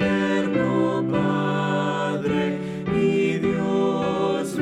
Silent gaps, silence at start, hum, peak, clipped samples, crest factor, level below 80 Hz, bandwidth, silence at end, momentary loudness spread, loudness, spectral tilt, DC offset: none; 0 s; none; -10 dBFS; under 0.1%; 12 dB; -52 dBFS; 12.5 kHz; 0 s; 3 LU; -23 LUFS; -7 dB/octave; under 0.1%